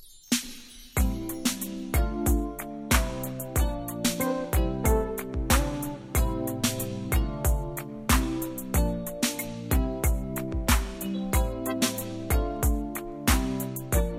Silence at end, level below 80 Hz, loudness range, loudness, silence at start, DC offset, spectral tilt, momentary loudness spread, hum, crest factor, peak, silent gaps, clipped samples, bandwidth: 0 s; -30 dBFS; 1 LU; -28 LUFS; 0 s; under 0.1%; -4.5 dB/octave; 7 LU; none; 20 dB; -8 dBFS; none; under 0.1%; 17 kHz